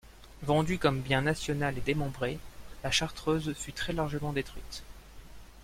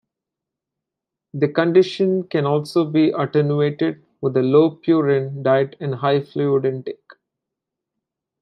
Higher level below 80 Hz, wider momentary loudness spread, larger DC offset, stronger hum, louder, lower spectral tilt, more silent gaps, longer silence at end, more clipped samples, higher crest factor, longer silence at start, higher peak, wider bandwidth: first, -48 dBFS vs -70 dBFS; first, 14 LU vs 9 LU; neither; neither; second, -31 LUFS vs -19 LUFS; second, -5 dB/octave vs -8 dB/octave; neither; second, 0 s vs 1.45 s; neither; about the same, 20 dB vs 18 dB; second, 0.05 s vs 1.35 s; second, -12 dBFS vs -2 dBFS; first, 16.5 kHz vs 10.5 kHz